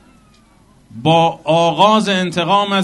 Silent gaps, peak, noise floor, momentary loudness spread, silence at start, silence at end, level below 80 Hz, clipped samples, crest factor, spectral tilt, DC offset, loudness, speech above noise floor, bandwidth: none; 0 dBFS; -49 dBFS; 5 LU; 0.95 s; 0 s; -54 dBFS; under 0.1%; 16 dB; -5 dB/octave; under 0.1%; -14 LUFS; 36 dB; 11.5 kHz